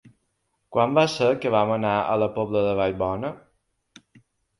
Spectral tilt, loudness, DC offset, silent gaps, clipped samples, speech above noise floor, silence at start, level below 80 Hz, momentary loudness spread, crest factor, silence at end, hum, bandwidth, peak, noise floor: -6 dB/octave; -23 LUFS; under 0.1%; none; under 0.1%; 51 dB; 0.05 s; -54 dBFS; 7 LU; 20 dB; 1.2 s; none; 11.5 kHz; -4 dBFS; -74 dBFS